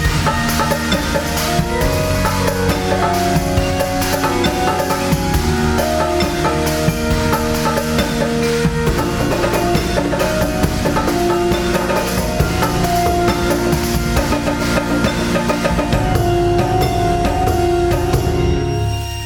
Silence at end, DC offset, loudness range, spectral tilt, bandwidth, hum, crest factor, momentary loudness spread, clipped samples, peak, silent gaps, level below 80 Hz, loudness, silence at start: 0 s; under 0.1%; 1 LU; -5 dB/octave; over 20 kHz; none; 16 dB; 2 LU; under 0.1%; 0 dBFS; none; -26 dBFS; -16 LUFS; 0 s